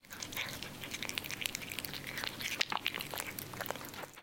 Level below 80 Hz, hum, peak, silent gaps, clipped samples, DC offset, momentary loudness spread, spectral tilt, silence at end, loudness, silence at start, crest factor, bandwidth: -64 dBFS; none; -10 dBFS; none; under 0.1%; under 0.1%; 7 LU; -1.5 dB/octave; 0 s; -39 LUFS; 0.05 s; 32 dB; 17 kHz